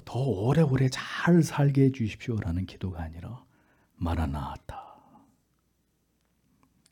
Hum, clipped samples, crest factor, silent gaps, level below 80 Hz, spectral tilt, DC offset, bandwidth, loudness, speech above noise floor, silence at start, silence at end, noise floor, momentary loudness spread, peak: none; under 0.1%; 16 dB; none; -48 dBFS; -7 dB/octave; under 0.1%; 17 kHz; -27 LUFS; 46 dB; 0.05 s; 2 s; -72 dBFS; 20 LU; -12 dBFS